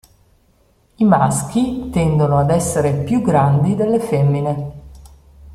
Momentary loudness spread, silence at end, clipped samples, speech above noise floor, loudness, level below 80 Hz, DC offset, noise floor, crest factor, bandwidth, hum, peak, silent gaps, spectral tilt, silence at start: 6 LU; 0 s; under 0.1%; 41 dB; -16 LUFS; -42 dBFS; under 0.1%; -56 dBFS; 16 dB; 14 kHz; none; -2 dBFS; none; -7 dB/octave; 1 s